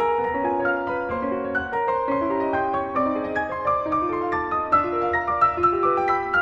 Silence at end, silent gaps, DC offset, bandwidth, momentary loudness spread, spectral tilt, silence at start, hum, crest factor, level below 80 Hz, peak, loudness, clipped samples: 0 s; none; under 0.1%; 7.4 kHz; 5 LU; -7.5 dB/octave; 0 s; none; 16 dB; -52 dBFS; -6 dBFS; -23 LUFS; under 0.1%